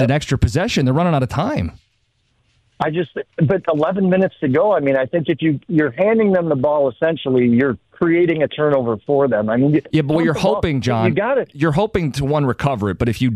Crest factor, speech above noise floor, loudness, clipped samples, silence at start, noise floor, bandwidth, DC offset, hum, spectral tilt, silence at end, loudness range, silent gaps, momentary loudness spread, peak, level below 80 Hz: 14 dB; 47 dB; -17 LUFS; under 0.1%; 0 s; -64 dBFS; 13 kHz; under 0.1%; none; -7.5 dB/octave; 0 s; 4 LU; none; 5 LU; -4 dBFS; -40 dBFS